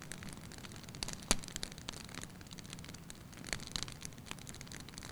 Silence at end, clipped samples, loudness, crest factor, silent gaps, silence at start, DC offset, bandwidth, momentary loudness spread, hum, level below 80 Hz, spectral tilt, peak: 0 s; under 0.1%; -44 LUFS; 36 dB; none; 0 s; under 0.1%; over 20 kHz; 13 LU; none; -54 dBFS; -2.5 dB/octave; -8 dBFS